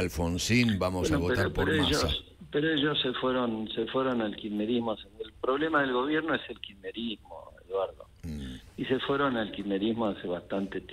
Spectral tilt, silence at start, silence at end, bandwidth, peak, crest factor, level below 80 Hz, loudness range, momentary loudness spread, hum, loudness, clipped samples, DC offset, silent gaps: -5 dB/octave; 0 s; 0 s; 16 kHz; -12 dBFS; 18 dB; -48 dBFS; 6 LU; 14 LU; none; -30 LUFS; under 0.1%; under 0.1%; none